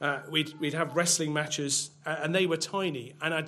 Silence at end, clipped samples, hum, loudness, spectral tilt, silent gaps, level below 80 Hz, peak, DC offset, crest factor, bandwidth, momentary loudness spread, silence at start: 0 s; under 0.1%; none; -29 LUFS; -3 dB/octave; none; -78 dBFS; -12 dBFS; under 0.1%; 18 dB; 15.5 kHz; 8 LU; 0 s